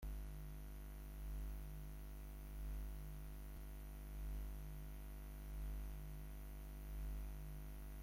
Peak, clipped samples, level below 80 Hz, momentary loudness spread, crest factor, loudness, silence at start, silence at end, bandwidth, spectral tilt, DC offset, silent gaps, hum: -40 dBFS; under 0.1%; -50 dBFS; 4 LU; 10 dB; -53 LUFS; 0 s; 0 s; 16.5 kHz; -6 dB/octave; under 0.1%; none; 50 Hz at -55 dBFS